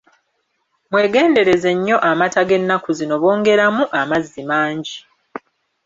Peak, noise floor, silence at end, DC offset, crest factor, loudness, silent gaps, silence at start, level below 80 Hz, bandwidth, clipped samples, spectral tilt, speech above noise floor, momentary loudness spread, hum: -2 dBFS; -69 dBFS; 0.5 s; under 0.1%; 14 dB; -16 LUFS; none; 0.9 s; -58 dBFS; 7.8 kHz; under 0.1%; -5 dB/octave; 53 dB; 18 LU; none